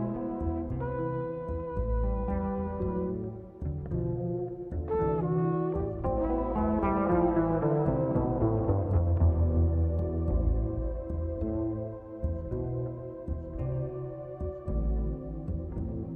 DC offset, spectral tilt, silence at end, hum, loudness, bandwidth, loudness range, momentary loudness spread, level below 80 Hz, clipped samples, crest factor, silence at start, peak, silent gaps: under 0.1%; -13 dB/octave; 0 s; none; -31 LUFS; 2.9 kHz; 8 LU; 10 LU; -36 dBFS; under 0.1%; 16 dB; 0 s; -14 dBFS; none